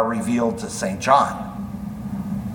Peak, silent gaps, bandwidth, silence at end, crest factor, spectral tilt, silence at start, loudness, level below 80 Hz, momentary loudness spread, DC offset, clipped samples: -2 dBFS; none; 19 kHz; 0 s; 20 dB; -5.5 dB/octave; 0 s; -22 LUFS; -46 dBFS; 14 LU; under 0.1%; under 0.1%